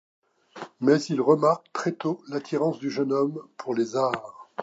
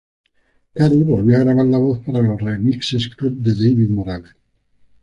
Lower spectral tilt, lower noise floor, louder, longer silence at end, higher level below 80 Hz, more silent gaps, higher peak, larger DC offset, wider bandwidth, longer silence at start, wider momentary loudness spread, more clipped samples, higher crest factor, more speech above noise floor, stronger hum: second, -6.5 dB/octave vs -8 dB/octave; second, -44 dBFS vs -61 dBFS; second, -25 LUFS vs -16 LUFS; second, 0 s vs 0.8 s; second, -76 dBFS vs -44 dBFS; neither; second, -6 dBFS vs -2 dBFS; neither; second, 8 kHz vs 9.8 kHz; second, 0.55 s vs 0.75 s; first, 13 LU vs 9 LU; neither; first, 20 dB vs 14 dB; second, 19 dB vs 46 dB; neither